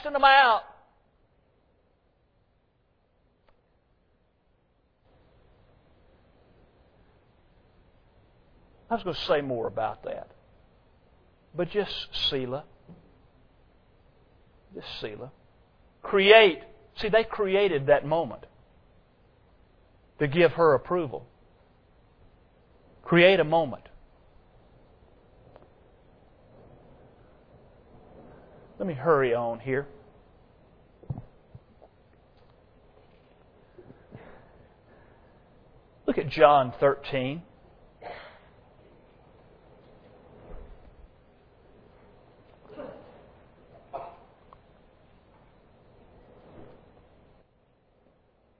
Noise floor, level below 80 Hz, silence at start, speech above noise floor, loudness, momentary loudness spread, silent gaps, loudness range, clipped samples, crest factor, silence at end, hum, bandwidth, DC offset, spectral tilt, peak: -69 dBFS; -58 dBFS; 0 s; 45 dB; -24 LUFS; 27 LU; none; 25 LU; under 0.1%; 28 dB; 1.95 s; none; 5.4 kHz; under 0.1%; -7 dB/octave; -2 dBFS